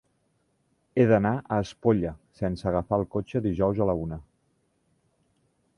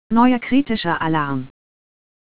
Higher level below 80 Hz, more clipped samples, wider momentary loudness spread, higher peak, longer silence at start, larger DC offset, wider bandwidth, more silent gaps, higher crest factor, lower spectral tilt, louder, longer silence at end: about the same, -48 dBFS vs -48 dBFS; neither; about the same, 11 LU vs 11 LU; second, -8 dBFS vs -2 dBFS; first, 0.95 s vs 0.1 s; neither; first, 10.5 kHz vs 4 kHz; neither; about the same, 20 dB vs 18 dB; second, -8.5 dB/octave vs -10 dB/octave; second, -26 LUFS vs -19 LUFS; first, 1.55 s vs 0.7 s